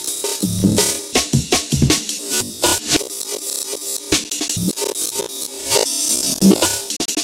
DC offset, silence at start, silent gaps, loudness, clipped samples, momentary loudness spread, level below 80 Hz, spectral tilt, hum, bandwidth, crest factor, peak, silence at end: under 0.1%; 0 s; none; -17 LUFS; under 0.1%; 8 LU; -38 dBFS; -3 dB/octave; none; 17 kHz; 18 dB; 0 dBFS; 0 s